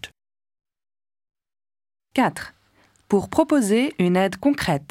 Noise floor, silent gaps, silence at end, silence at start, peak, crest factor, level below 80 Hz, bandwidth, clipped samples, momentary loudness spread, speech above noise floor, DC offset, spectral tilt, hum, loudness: -60 dBFS; none; 0.05 s; 0.05 s; -4 dBFS; 18 dB; -54 dBFS; 16 kHz; under 0.1%; 13 LU; 40 dB; under 0.1%; -5.5 dB/octave; none; -21 LUFS